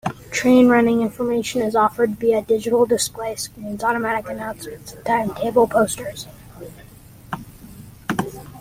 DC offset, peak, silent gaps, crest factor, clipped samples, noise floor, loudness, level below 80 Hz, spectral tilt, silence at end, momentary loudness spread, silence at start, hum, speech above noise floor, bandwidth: under 0.1%; -4 dBFS; none; 18 dB; under 0.1%; -44 dBFS; -19 LUFS; -50 dBFS; -4.5 dB/octave; 0 s; 18 LU; 0.05 s; none; 25 dB; 16.5 kHz